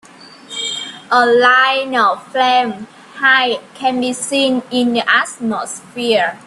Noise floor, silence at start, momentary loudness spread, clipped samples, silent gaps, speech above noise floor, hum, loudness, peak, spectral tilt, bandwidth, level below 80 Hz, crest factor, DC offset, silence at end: -38 dBFS; 0.2 s; 13 LU; under 0.1%; none; 23 dB; none; -14 LUFS; 0 dBFS; -2 dB/octave; 12.5 kHz; -64 dBFS; 16 dB; under 0.1%; 0.1 s